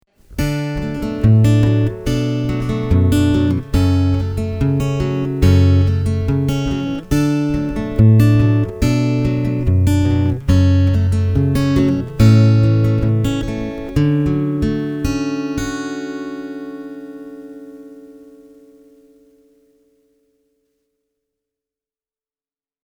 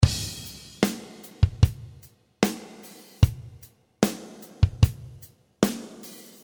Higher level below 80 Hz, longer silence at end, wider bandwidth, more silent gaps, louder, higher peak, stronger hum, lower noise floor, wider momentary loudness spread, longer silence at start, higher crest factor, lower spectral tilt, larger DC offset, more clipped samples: about the same, -30 dBFS vs -34 dBFS; first, 4.6 s vs 0.3 s; second, 16.5 kHz vs over 20 kHz; neither; first, -16 LUFS vs -26 LUFS; about the same, 0 dBFS vs -2 dBFS; neither; first, under -90 dBFS vs -52 dBFS; second, 14 LU vs 21 LU; first, 0.3 s vs 0 s; second, 16 dB vs 24 dB; first, -8 dB/octave vs -5.5 dB/octave; neither; neither